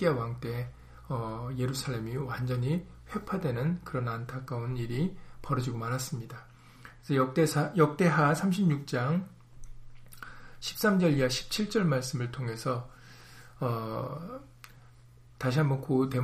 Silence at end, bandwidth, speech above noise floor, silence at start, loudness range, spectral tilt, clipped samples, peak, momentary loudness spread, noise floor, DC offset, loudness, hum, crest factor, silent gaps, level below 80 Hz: 0 s; 15.5 kHz; 25 dB; 0 s; 7 LU; -6 dB/octave; under 0.1%; -12 dBFS; 17 LU; -55 dBFS; under 0.1%; -31 LUFS; none; 20 dB; none; -54 dBFS